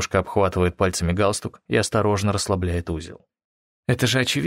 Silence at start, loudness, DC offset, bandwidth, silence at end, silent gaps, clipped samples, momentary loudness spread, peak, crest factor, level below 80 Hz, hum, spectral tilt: 0 s; -22 LUFS; under 0.1%; 16 kHz; 0 s; 3.44-3.83 s; under 0.1%; 10 LU; -4 dBFS; 18 dB; -42 dBFS; none; -4.5 dB/octave